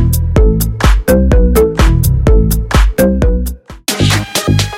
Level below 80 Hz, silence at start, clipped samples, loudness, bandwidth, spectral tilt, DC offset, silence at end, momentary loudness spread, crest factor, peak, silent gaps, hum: -12 dBFS; 0 s; under 0.1%; -12 LUFS; 17 kHz; -5.5 dB/octave; under 0.1%; 0 s; 5 LU; 10 dB; 0 dBFS; none; none